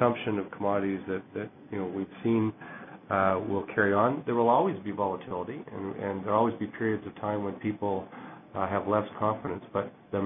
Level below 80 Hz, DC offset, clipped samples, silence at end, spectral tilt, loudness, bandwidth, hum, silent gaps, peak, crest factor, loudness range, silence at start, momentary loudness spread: -60 dBFS; under 0.1%; under 0.1%; 0 s; -11 dB/octave; -30 LUFS; 3.8 kHz; none; none; -8 dBFS; 20 dB; 4 LU; 0 s; 12 LU